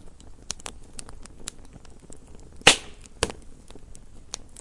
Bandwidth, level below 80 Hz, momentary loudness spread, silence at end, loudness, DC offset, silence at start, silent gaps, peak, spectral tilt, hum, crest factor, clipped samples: 11.5 kHz; -46 dBFS; 26 LU; 0 s; -23 LUFS; under 0.1%; 0 s; none; 0 dBFS; -1 dB/octave; none; 30 dB; under 0.1%